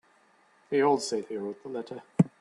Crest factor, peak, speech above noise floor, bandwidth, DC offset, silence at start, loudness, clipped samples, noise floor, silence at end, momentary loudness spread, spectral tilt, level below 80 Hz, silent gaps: 24 dB; -6 dBFS; 34 dB; 11.5 kHz; under 0.1%; 0.7 s; -30 LUFS; under 0.1%; -64 dBFS; 0.15 s; 13 LU; -6 dB/octave; -72 dBFS; none